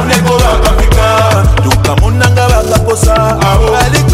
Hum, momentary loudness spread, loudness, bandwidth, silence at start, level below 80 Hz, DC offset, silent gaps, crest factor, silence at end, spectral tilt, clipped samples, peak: none; 1 LU; -9 LUFS; 16 kHz; 0 s; -12 dBFS; under 0.1%; none; 8 dB; 0 s; -5 dB/octave; under 0.1%; 0 dBFS